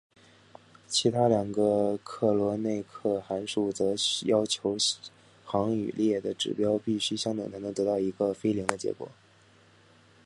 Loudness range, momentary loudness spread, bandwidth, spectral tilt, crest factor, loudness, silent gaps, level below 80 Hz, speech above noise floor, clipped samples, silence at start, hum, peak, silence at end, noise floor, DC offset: 2 LU; 7 LU; 11.5 kHz; -4.5 dB/octave; 26 dB; -28 LUFS; none; -64 dBFS; 31 dB; under 0.1%; 0.9 s; none; -4 dBFS; 1.15 s; -59 dBFS; under 0.1%